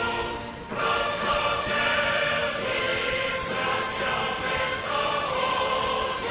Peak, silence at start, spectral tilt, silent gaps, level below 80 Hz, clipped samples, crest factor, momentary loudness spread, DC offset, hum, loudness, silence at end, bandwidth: -12 dBFS; 0 s; -1 dB/octave; none; -48 dBFS; under 0.1%; 14 dB; 4 LU; under 0.1%; none; -25 LUFS; 0 s; 4 kHz